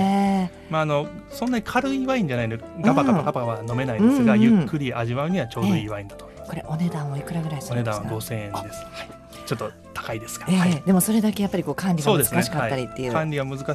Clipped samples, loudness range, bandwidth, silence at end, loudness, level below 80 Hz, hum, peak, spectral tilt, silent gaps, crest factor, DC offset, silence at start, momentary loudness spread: under 0.1%; 8 LU; 13.5 kHz; 0 s; -23 LUFS; -50 dBFS; none; -4 dBFS; -6 dB/octave; none; 18 dB; under 0.1%; 0 s; 14 LU